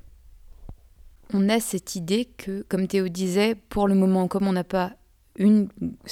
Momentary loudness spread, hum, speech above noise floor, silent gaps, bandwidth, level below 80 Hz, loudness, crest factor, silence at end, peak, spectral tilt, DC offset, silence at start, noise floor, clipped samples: 11 LU; none; 27 dB; none; 15.5 kHz; -50 dBFS; -24 LUFS; 16 dB; 0 s; -8 dBFS; -6 dB/octave; under 0.1%; 0.05 s; -50 dBFS; under 0.1%